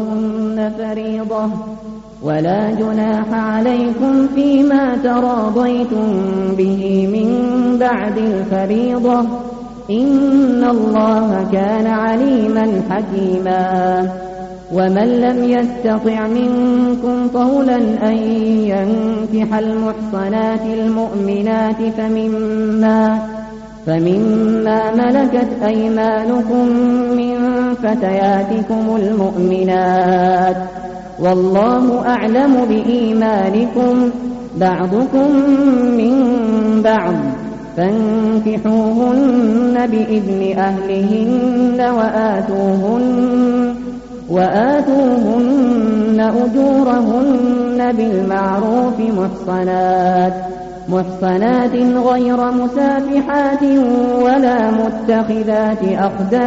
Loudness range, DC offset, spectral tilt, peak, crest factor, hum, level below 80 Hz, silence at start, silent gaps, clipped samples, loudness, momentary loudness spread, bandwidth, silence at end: 2 LU; under 0.1%; -6.5 dB/octave; -4 dBFS; 10 dB; none; -44 dBFS; 0 s; none; under 0.1%; -15 LUFS; 6 LU; 7.8 kHz; 0 s